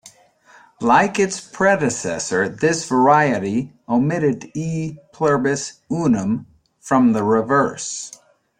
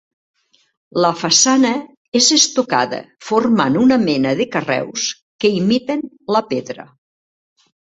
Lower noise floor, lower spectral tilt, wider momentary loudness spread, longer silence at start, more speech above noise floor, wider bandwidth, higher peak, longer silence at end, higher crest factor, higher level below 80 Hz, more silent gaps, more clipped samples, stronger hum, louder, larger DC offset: second, -51 dBFS vs under -90 dBFS; first, -5 dB/octave vs -3 dB/octave; about the same, 11 LU vs 13 LU; second, 0.05 s vs 0.95 s; second, 33 dB vs over 74 dB; first, 10.5 kHz vs 8.2 kHz; about the same, -2 dBFS vs 0 dBFS; second, 0.5 s vs 1 s; about the same, 18 dB vs 18 dB; about the same, -56 dBFS vs -58 dBFS; second, none vs 1.97-2.12 s, 5.22-5.39 s; neither; neither; second, -19 LUFS vs -16 LUFS; neither